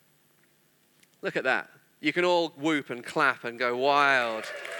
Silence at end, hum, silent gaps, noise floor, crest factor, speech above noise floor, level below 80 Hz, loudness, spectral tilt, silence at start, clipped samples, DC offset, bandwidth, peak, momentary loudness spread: 0 s; none; none; -65 dBFS; 20 dB; 39 dB; -86 dBFS; -27 LUFS; -4 dB/octave; 1.25 s; under 0.1%; under 0.1%; 19.5 kHz; -8 dBFS; 10 LU